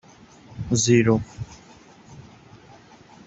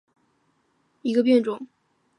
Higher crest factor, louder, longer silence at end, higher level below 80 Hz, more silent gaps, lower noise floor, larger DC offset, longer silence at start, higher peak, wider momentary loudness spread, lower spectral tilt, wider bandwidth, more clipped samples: about the same, 20 dB vs 18 dB; about the same, -20 LUFS vs -22 LUFS; first, 1.05 s vs 0.55 s; first, -52 dBFS vs -80 dBFS; neither; second, -49 dBFS vs -68 dBFS; neither; second, 0.5 s vs 1.05 s; about the same, -6 dBFS vs -8 dBFS; first, 21 LU vs 18 LU; second, -5 dB/octave vs -6.5 dB/octave; second, 8.2 kHz vs 10.5 kHz; neither